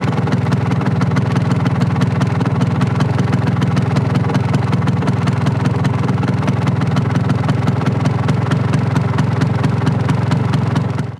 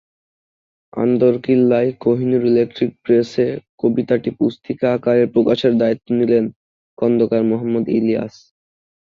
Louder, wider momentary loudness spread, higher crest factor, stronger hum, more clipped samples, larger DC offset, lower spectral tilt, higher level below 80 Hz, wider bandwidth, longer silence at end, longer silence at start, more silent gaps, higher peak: about the same, -16 LUFS vs -17 LUFS; second, 1 LU vs 6 LU; about the same, 14 dB vs 14 dB; neither; neither; neither; about the same, -7.5 dB/octave vs -8.5 dB/octave; first, -40 dBFS vs -58 dBFS; first, 11 kHz vs 7 kHz; second, 0 s vs 0.8 s; second, 0 s vs 0.95 s; second, none vs 3.69-3.78 s, 6.56-6.97 s; about the same, -2 dBFS vs -2 dBFS